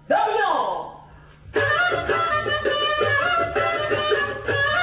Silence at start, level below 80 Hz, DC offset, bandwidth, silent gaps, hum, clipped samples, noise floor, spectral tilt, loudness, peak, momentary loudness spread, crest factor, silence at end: 0.1 s; -48 dBFS; under 0.1%; 4 kHz; none; none; under 0.1%; -46 dBFS; -7.5 dB/octave; -21 LUFS; -10 dBFS; 5 LU; 12 dB; 0 s